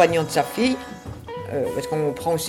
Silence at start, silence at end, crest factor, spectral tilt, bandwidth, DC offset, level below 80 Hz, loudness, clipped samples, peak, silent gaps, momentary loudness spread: 0 s; 0 s; 20 dB; -5 dB/octave; 17.5 kHz; under 0.1%; -52 dBFS; -24 LUFS; under 0.1%; -2 dBFS; none; 14 LU